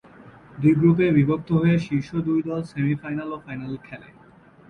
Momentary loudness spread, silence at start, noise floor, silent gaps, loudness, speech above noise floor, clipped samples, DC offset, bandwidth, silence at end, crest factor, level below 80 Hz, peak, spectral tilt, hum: 16 LU; 0.2 s; -51 dBFS; none; -22 LUFS; 29 dB; under 0.1%; under 0.1%; 6.6 kHz; 0.65 s; 16 dB; -54 dBFS; -6 dBFS; -9.5 dB/octave; none